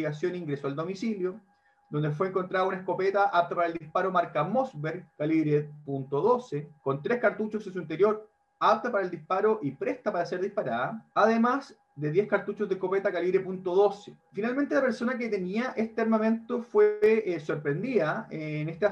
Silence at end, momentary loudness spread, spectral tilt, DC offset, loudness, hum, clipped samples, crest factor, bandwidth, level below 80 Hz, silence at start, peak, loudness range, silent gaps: 0 s; 9 LU; -7.5 dB/octave; under 0.1%; -28 LUFS; none; under 0.1%; 18 dB; 8.2 kHz; -74 dBFS; 0 s; -10 dBFS; 2 LU; none